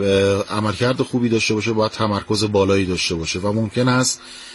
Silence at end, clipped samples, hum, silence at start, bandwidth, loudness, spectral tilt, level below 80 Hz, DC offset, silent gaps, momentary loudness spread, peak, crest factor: 0 s; under 0.1%; none; 0 s; 11.5 kHz; -19 LUFS; -4.5 dB/octave; -50 dBFS; under 0.1%; none; 4 LU; -4 dBFS; 14 dB